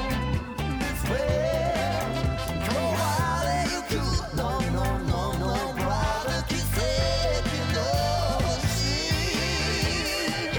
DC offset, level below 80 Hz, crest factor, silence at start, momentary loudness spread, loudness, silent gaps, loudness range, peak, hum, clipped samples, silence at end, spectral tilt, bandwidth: under 0.1%; -34 dBFS; 12 dB; 0 s; 3 LU; -26 LUFS; none; 2 LU; -14 dBFS; none; under 0.1%; 0 s; -4.5 dB/octave; over 20 kHz